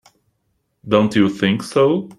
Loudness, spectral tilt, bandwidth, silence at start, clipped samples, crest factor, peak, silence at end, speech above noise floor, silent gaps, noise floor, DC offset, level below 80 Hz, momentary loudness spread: -17 LUFS; -6.5 dB/octave; 12.5 kHz; 0.85 s; under 0.1%; 16 dB; -2 dBFS; 0.05 s; 53 dB; none; -69 dBFS; under 0.1%; -56 dBFS; 3 LU